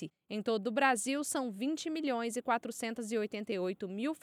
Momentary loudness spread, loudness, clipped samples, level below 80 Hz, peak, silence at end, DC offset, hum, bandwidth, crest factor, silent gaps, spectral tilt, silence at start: 8 LU; -35 LUFS; under 0.1%; -86 dBFS; -16 dBFS; 0.05 s; under 0.1%; none; 19 kHz; 20 dB; none; -3.5 dB/octave; 0 s